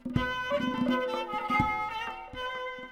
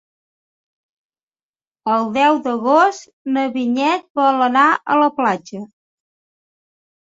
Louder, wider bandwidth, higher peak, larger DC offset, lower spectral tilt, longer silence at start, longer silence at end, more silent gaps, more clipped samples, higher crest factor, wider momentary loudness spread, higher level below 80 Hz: second, -31 LUFS vs -16 LUFS; first, 16 kHz vs 8 kHz; second, -12 dBFS vs -2 dBFS; neither; first, -6 dB/octave vs -4.5 dB/octave; second, 0 s vs 1.85 s; second, 0 s vs 1.45 s; second, none vs 3.13-3.25 s, 4.10-4.15 s; neither; about the same, 20 dB vs 18 dB; about the same, 9 LU vs 11 LU; first, -50 dBFS vs -68 dBFS